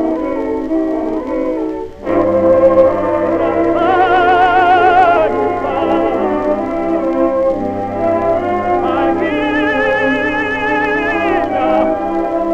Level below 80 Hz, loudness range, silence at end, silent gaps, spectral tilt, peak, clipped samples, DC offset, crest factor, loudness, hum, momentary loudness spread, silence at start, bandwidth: -38 dBFS; 4 LU; 0 s; none; -7 dB/octave; 0 dBFS; under 0.1%; under 0.1%; 14 dB; -14 LUFS; none; 8 LU; 0 s; 8 kHz